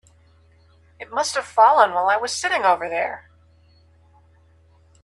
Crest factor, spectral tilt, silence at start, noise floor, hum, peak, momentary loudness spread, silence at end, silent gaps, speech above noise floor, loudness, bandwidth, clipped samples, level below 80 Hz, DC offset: 22 dB; -1.5 dB/octave; 1 s; -55 dBFS; none; -2 dBFS; 14 LU; 1.85 s; none; 36 dB; -19 LUFS; 12.5 kHz; under 0.1%; -62 dBFS; under 0.1%